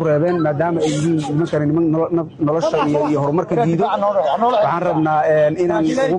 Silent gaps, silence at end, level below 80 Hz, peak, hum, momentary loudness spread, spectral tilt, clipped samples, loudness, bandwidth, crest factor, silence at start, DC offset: none; 0 s; -52 dBFS; -6 dBFS; none; 3 LU; -7 dB/octave; under 0.1%; -17 LUFS; 10.5 kHz; 10 dB; 0 s; under 0.1%